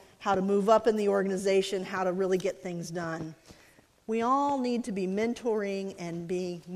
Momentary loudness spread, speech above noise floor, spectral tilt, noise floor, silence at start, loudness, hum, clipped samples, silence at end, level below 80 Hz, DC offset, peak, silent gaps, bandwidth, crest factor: 12 LU; 31 dB; -5.5 dB/octave; -60 dBFS; 0.2 s; -29 LUFS; none; under 0.1%; 0 s; -66 dBFS; under 0.1%; -10 dBFS; none; 14 kHz; 20 dB